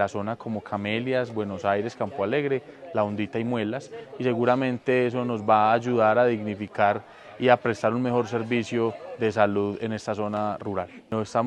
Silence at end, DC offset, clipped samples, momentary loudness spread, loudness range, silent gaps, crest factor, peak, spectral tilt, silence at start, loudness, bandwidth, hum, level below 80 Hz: 0 s; under 0.1%; under 0.1%; 10 LU; 5 LU; none; 22 dB; -4 dBFS; -6.5 dB/octave; 0 s; -25 LUFS; 9.8 kHz; none; -70 dBFS